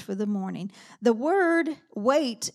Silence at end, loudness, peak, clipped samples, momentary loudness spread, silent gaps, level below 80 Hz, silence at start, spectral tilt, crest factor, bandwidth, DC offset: 0.05 s; -25 LUFS; -8 dBFS; under 0.1%; 12 LU; none; -82 dBFS; 0 s; -4.5 dB/octave; 18 dB; 14.5 kHz; under 0.1%